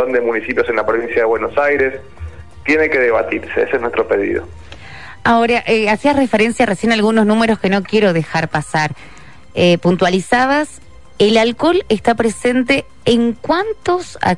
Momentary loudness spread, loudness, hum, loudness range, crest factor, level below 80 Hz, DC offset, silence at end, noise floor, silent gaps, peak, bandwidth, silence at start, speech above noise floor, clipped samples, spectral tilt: 8 LU; -15 LUFS; none; 2 LU; 14 dB; -44 dBFS; 1%; 0 s; -35 dBFS; none; -2 dBFS; 11.5 kHz; 0 s; 20 dB; under 0.1%; -5.5 dB/octave